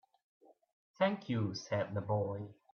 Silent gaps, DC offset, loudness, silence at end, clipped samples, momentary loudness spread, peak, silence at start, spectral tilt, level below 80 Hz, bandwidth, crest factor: none; under 0.1%; -37 LUFS; 0.2 s; under 0.1%; 4 LU; -18 dBFS; 1 s; -6.5 dB/octave; -76 dBFS; 6.8 kHz; 20 dB